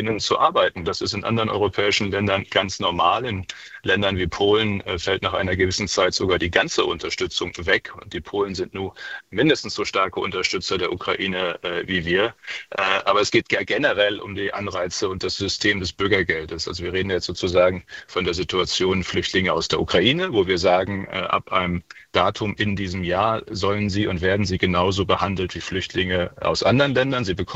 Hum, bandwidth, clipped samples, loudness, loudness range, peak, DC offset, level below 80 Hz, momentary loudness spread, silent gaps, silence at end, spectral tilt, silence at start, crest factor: none; 8.2 kHz; under 0.1%; -22 LUFS; 3 LU; -2 dBFS; under 0.1%; -48 dBFS; 8 LU; none; 0 s; -4.5 dB/octave; 0 s; 20 dB